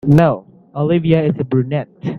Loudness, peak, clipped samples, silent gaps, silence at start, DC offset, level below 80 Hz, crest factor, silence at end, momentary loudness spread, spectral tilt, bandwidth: -16 LUFS; 0 dBFS; under 0.1%; none; 0.05 s; under 0.1%; -46 dBFS; 16 dB; 0 s; 11 LU; -9.5 dB/octave; 6.2 kHz